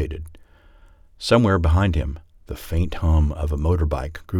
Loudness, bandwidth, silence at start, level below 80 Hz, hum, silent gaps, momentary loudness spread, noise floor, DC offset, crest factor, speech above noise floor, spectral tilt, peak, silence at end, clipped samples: -21 LUFS; 14 kHz; 0 s; -30 dBFS; none; none; 18 LU; -50 dBFS; under 0.1%; 18 dB; 30 dB; -7 dB/octave; -4 dBFS; 0 s; under 0.1%